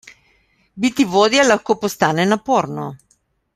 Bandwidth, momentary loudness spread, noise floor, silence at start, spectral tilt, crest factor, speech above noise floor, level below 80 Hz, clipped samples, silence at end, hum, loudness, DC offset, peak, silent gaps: 15.5 kHz; 11 LU; -62 dBFS; 0.05 s; -4 dB/octave; 18 dB; 46 dB; -58 dBFS; under 0.1%; 0.6 s; none; -16 LUFS; under 0.1%; 0 dBFS; none